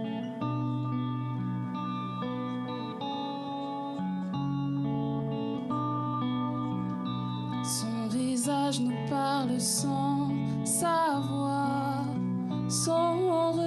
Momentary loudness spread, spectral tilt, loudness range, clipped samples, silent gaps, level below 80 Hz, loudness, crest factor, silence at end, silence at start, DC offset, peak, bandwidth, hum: 8 LU; -5.5 dB/octave; 5 LU; under 0.1%; none; -66 dBFS; -31 LUFS; 16 dB; 0 s; 0 s; under 0.1%; -14 dBFS; 12.5 kHz; none